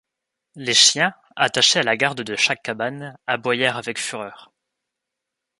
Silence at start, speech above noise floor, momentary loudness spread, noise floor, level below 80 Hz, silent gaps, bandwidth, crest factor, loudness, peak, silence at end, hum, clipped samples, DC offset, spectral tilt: 0.55 s; 62 dB; 15 LU; -83 dBFS; -68 dBFS; none; 11.5 kHz; 22 dB; -19 LUFS; 0 dBFS; 1.15 s; none; under 0.1%; under 0.1%; -1 dB/octave